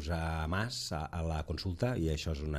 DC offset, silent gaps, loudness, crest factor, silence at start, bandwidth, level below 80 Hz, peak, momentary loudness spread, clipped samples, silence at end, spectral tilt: under 0.1%; none; -36 LUFS; 14 dB; 0 s; 14.5 kHz; -44 dBFS; -20 dBFS; 4 LU; under 0.1%; 0 s; -5.5 dB/octave